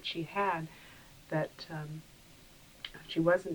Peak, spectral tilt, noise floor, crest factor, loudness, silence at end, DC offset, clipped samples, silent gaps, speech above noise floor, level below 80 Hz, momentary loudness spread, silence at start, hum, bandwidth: -16 dBFS; -6 dB/octave; -57 dBFS; 20 dB; -35 LUFS; 0 s; under 0.1%; under 0.1%; none; 23 dB; -64 dBFS; 25 LU; 0 s; none; over 20 kHz